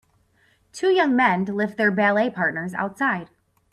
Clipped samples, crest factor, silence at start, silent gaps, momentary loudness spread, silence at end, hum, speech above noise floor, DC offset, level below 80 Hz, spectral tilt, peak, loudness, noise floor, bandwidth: under 0.1%; 16 dB; 0.75 s; none; 9 LU; 0.5 s; none; 41 dB; under 0.1%; -66 dBFS; -6 dB/octave; -6 dBFS; -21 LUFS; -62 dBFS; 12.5 kHz